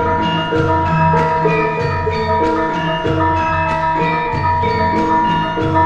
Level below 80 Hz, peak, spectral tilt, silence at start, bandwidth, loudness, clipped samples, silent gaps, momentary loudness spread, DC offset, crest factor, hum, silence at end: -36 dBFS; -2 dBFS; -7 dB/octave; 0 s; 8.4 kHz; -15 LUFS; under 0.1%; none; 3 LU; under 0.1%; 12 dB; none; 0 s